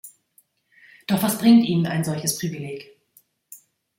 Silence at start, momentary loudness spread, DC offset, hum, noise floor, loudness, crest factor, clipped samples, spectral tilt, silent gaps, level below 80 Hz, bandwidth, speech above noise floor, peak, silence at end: 0.05 s; 19 LU; under 0.1%; none; -62 dBFS; -21 LUFS; 18 dB; under 0.1%; -5 dB/octave; none; -64 dBFS; 17 kHz; 42 dB; -6 dBFS; 0.4 s